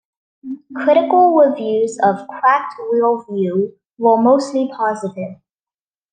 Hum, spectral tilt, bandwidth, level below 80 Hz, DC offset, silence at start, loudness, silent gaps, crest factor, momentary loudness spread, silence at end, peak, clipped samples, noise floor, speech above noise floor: none; -6.5 dB/octave; 9.6 kHz; -70 dBFS; under 0.1%; 0.45 s; -16 LUFS; none; 14 dB; 14 LU; 0.8 s; -2 dBFS; under 0.1%; under -90 dBFS; over 74 dB